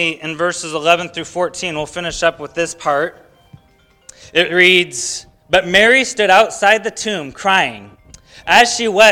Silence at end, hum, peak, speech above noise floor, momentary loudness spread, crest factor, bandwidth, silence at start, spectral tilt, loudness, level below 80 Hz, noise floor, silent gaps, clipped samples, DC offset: 0 s; none; 0 dBFS; 38 dB; 12 LU; 16 dB; over 20 kHz; 0 s; -2.5 dB/octave; -14 LUFS; -48 dBFS; -53 dBFS; none; 0.3%; under 0.1%